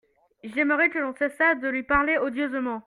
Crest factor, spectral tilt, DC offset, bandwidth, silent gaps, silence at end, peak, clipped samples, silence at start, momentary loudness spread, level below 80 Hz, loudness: 18 dB; -6 dB/octave; under 0.1%; 11.5 kHz; none; 0.05 s; -6 dBFS; under 0.1%; 0.45 s; 6 LU; -52 dBFS; -24 LUFS